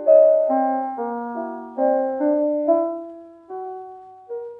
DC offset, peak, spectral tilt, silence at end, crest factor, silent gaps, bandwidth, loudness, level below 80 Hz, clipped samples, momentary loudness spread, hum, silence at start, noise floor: under 0.1%; -4 dBFS; -9 dB/octave; 0 s; 18 dB; none; 2.7 kHz; -20 LUFS; -76 dBFS; under 0.1%; 19 LU; none; 0 s; -40 dBFS